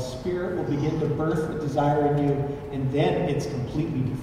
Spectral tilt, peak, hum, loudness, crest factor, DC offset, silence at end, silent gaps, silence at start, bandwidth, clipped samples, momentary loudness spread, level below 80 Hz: -7.5 dB/octave; -10 dBFS; none; -26 LUFS; 14 dB; under 0.1%; 0 s; none; 0 s; 13.5 kHz; under 0.1%; 7 LU; -46 dBFS